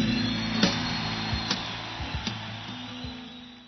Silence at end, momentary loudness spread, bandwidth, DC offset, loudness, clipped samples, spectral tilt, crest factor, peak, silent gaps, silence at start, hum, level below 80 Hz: 0 s; 13 LU; 6.4 kHz; under 0.1%; -29 LUFS; under 0.1%; -4.5 dB/octave; 22 dB; -8 dBFS; none; 0 s; none; -46 dBFS